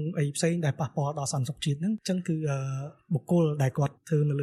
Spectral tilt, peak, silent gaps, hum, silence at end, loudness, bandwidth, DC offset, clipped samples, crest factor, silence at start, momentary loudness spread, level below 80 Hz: -6.5 dB/octave; -14 dBFS; none; none; 0 s; -29 LUFS; 13 kHz; under 0.1%; under 0.1%; 14 dB; 0 s; 6 LU; -66 dBFS